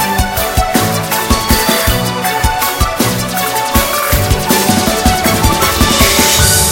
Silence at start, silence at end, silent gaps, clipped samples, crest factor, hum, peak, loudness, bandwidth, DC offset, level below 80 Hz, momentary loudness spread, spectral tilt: 0 s; 0 s; none; 0.4%; 12 dB; none; 0 dBFS; -11 LUFS; over 20 kHz; under 0.1%; -20 dBFS; 6 LU; -3 dB/octave